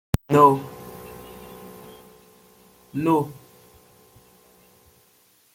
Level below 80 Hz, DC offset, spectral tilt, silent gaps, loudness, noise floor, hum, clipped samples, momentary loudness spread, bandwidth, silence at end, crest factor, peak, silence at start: -50 dBFS; under 0.1%; -7.5 dB/octave; none; -20 LUFS; -60 dBFS; none; under 0.1%; 27 LU; 16.5 kHz; 2.25 s; 24 dB; -2 dBFS; 0.15 s